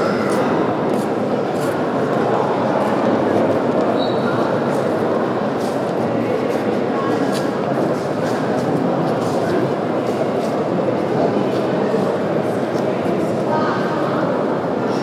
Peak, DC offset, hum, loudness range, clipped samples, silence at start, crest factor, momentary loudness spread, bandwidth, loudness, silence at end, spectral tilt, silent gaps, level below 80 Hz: -4 dBFS; under 0.1%; none; 1 LU; under 0.1%; 0 s; 14 dB; 3 LU; 15.5 kHz; -19 LUFS; 0 s; -7 dB/octave; none; -62 dBFS